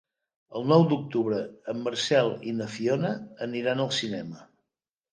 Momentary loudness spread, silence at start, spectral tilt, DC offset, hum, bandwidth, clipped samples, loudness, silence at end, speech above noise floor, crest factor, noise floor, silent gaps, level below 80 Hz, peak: 13 LU; 0.5 s; -5.5 dB/octave; under 0.1%; none; 10 kHz; under 0.1%; -27 LUFS; 0.7 s; 61 dB; 20 dB; -88 dBFS; none; -72 dBFS; -8 dBFS